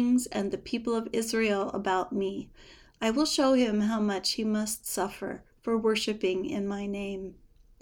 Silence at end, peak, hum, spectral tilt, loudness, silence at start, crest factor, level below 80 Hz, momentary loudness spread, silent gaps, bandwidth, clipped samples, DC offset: 0.5 s; -14 dBFS; none; -4 dB/octave; -29 LUFS; 0 s; 16 dB; -58 dBFS; 12 LU; none; over 20 kHz; under 0.1%; under 0.1%